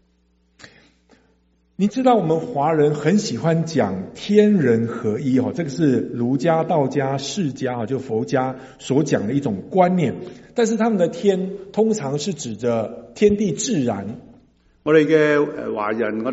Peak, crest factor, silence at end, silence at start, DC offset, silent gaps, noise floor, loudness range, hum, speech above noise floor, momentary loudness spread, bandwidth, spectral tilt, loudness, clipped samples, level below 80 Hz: -2 dBFS; 18 dB; 0 s; 0.65 s; under 0.1%; none; -62 dBFS; 3 LU; none; 42 dB; 9 LU; 8 kHz; -6 dB/octave; -20 LUFS; under 0.1%; -56 dBFS